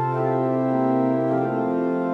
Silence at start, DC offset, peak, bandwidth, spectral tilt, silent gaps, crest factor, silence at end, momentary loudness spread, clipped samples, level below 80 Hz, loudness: 0 s; under 0.1%; -10 dBFS; 5 kHz; -10.5 dB/octave; none; 12 dB; 0 s; 2 LU; under 0.1%; -68 dBFS; -22 LUFS